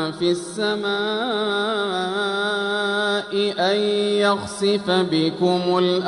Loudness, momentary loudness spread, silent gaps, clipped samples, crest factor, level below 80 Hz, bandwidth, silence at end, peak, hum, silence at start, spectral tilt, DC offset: -21 LUFS; 4 LU; none; under 0.1%; 14 dB; -62 dBFS; 11.5 kHz; 0 s; -6 dBFS; none; 0 s; -4.5 dB/octave; under 0.1%